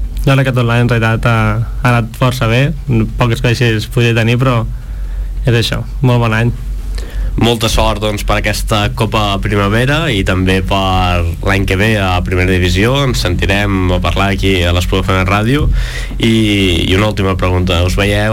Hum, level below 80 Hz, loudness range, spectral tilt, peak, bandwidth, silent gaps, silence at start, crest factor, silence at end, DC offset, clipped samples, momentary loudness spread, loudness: none; -20 dBFS; 2 LU; -5.5 dB/octave; -2 dBFS; 16.5 kHz; none; 0 s; 10 dB; 0 s; under 0.1%; under 0.1%; 5 LU; -13 LUFS